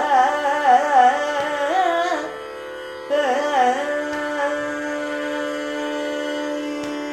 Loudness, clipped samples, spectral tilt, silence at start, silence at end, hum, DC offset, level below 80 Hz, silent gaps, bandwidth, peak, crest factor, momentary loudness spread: -21 LUFS; under 0.1%; -2.5 dB/octave; 0 s; 0 s; none; under 0.1%; -62 dBFS; none; 14 kHz; -4 dBFS; 16 dB; 11 LU